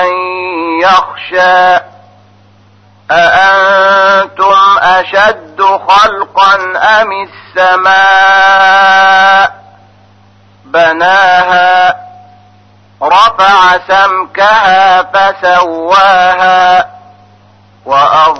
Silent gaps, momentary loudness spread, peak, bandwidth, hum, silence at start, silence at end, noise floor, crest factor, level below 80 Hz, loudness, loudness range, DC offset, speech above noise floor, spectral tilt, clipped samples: none; 8 LU; 0 dBFS; 8.4 kHz; none; 0 s; 0 s; -42 dBFS; 8 dB; -46 dBFS; -6 LUFS; 3 LU; under 0.1%; 36 dB; -2.5 dB/octave; 0.6%